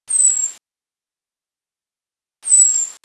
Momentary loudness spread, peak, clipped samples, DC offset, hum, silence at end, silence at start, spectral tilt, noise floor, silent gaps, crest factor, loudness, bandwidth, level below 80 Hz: 13 LU; -2 dBFS; under 0.1%; under 0.1%; none; 0.1 s; 0.1 s; 4.5 dB/octave; under -90 dBFS; none; 18 dB; -12 LUFS; 12 kHz; -78 dBFS